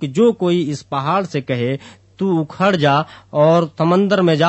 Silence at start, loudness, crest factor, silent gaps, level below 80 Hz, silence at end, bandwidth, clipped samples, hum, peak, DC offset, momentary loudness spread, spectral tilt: 0 s; -17 LUFS; 14 dB; none; -58 dBFS; 0 s; 8.4 kHz; under 0.1%; none; -2 dBFS; under 0.1%; 8 LU; -7 dB/octave